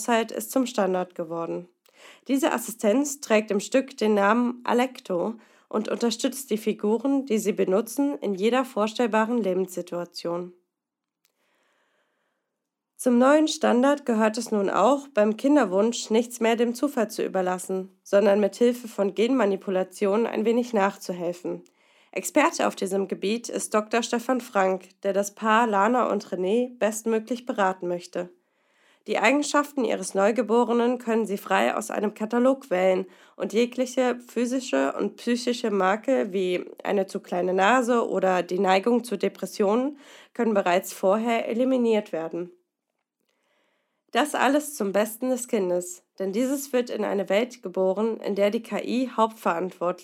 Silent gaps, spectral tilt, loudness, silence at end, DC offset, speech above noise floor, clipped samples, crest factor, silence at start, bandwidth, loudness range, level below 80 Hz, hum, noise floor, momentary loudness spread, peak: none; -4.5 dB/octave; -25 LUFS; 0 s; under 0.1%; 62 dB; under 0.1%; 20 dB; 0 s; 17 kHz; 4 LU; -88 dBFS; none; -86 dBFS; 9 LU; -4 dBFS